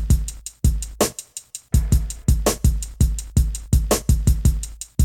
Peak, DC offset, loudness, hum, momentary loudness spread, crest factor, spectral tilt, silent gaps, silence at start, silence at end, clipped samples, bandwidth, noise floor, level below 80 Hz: -6 dBFS; under 0.1%; -22 LUFS; none; 10 LU; 14 dB; -5.5 dB/octave; none; 0 s; 0 s; under 0.1%; 17.5 kHz; -38 dBFS; -22 dBFS